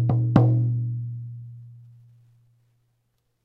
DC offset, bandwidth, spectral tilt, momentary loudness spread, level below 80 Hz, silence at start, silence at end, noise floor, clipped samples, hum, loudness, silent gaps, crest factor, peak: under 0.1%; 4.2 kHz; -11 dB/octave; 23 LU; -54 dBFS; 0 s; 1.65 s; -72 dBFS; under 0.1%; none; -22 LUFS; none; 24 dB; -2 dBFS